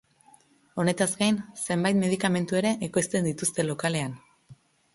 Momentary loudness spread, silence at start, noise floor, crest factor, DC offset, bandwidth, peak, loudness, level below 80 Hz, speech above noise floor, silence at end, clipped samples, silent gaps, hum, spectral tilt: 6 LU; 0.75 s; -59 dBFS; 18 dB; under 0.1%; 11.5 kHz; -10 dBFS; -26 LUFS; -64 dBFS; 33 dB; 0.4 s; under 0.1%; none; none; -4.5 dB/octave